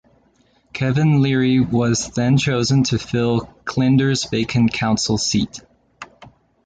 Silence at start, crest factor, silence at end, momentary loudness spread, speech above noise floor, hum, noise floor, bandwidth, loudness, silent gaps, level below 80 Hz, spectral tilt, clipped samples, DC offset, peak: 0.75 s; 14 dB; 0.4 s; 9 LU; 41 dB; none; -58 dBFS; 9.2 kHz; -18 LUFS; none; -46 dBFS; -5.5 dB/octave; under 0.1%; under 0.1%; -6 dBFS